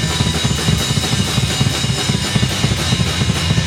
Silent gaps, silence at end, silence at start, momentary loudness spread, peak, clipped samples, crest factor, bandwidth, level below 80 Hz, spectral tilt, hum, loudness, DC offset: none; 0 s; 0 s; 1 LU; -2 dBFS; under 0.1%; 14 dB; 16.5 kHz; -30 dBFS; -4 dB/octave; none; -16 LUFS; under 0.1%